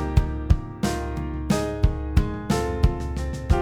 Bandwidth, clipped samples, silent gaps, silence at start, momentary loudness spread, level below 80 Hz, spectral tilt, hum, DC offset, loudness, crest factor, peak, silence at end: 15 kHz; under 0.1%; none; 0 s; 7 LU; -26 dBFS; -6.5 dB/octave; none; under 0.1%; -25 LUFS; 20 dB; -4 dBFS; 0 s